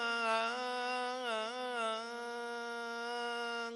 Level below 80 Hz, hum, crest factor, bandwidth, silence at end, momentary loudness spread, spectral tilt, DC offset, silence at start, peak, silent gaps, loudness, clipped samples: under -90 dBFS; none; 18 dB; 12 kHz; 0 s; 8 LU; -1.5 dB/octave; under 0.1%; 0 s; -20 dBFS; none; -38 LUFS; under 0.1%